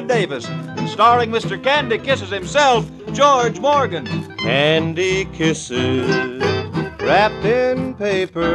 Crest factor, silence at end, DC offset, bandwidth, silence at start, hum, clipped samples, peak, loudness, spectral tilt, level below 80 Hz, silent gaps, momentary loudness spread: 16 dB; 0 s; under 0.1%; 11 kHz; 0 s; none; under 0.1%; -2 dBFS; -17 LUFS; -5 dB/octave; -46 dBFS; none; 9 LU